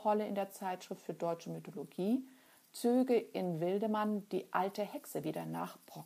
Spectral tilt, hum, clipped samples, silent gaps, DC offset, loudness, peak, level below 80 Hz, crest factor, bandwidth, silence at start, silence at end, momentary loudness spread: -6.5 dB/octave; none; under 0.1%; none; under 0.1%; -37 LUFS; -18 dBFS; -88 dBFS; 20 dB; 15.5 kHz; 0 s; 0 s; 12 LU